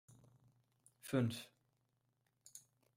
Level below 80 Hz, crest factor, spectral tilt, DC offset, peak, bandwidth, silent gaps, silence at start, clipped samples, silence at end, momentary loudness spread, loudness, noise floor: -80 dBFS; 22 dB; -6 dB/octave; under 0.1%; -24 dBFS; 16 kHz; none; 0.1 s; under 0.1%; 0.4 s; 21 LU; -41 LUFS; -83 dBFS